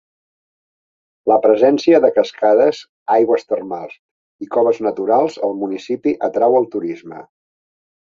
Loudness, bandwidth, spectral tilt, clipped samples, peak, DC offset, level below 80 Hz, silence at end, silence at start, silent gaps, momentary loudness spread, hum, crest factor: -16 LUFS; 7.4 kHz; -6 dB/octave; under 0.1%; -2 dBFS; under 0.1%; -64 dBFS; 0.85 s; 1.25 s; 2.89-3.06 s, 3.99-4.39 s; 16 LU; none; 16 dB